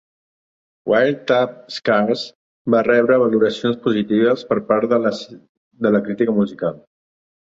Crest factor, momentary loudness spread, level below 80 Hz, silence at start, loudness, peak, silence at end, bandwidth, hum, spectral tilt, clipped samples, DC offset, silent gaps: 16 dB; 11 LU; -60 dBFS; 0.85 s; -18 LUFS; -2 dBFS; 0.7 s; 7.8 kHz; none; -6.5 dB/octave; under 0.1%; under 0.1%; 2.35-2.65 s, 5.49-5.71 s